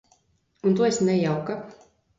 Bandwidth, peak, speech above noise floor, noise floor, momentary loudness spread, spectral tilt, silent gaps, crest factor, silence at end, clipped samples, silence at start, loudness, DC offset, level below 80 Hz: 7.8 kHz; -10 dBFS; 44 dB; -67 dBFS; 14 LU; -6 dB/octave; none; 16 dB; 0.45 s; under 0.1%; 0.65 s; -24 LUFS; under 0.1%; -64 dBFS